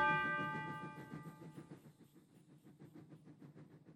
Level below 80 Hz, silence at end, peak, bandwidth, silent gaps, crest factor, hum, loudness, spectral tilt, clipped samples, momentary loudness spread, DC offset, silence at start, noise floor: -78 dBFS; 0 s; -24 dBFS; 16 kHz; none; 22 dB; none; -43 LUFS; -6 dB/octave; under 0.1%; 26 LU; under 0.1%; 0 s; -66 dBFS